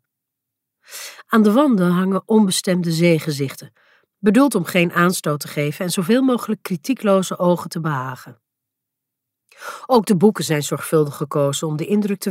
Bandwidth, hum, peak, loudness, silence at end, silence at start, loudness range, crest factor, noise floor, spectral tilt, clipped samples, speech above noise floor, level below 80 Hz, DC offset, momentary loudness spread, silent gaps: 16 kHz; none; -2 dBFS; -18 LUFS; 0 s; 0.9 s; 4 LU; 16 dB; -81 dBFS; -5.5 dB/octave; under 0.1%; 63 dB; -68 dBFS; under 0.1%; 13 LU; none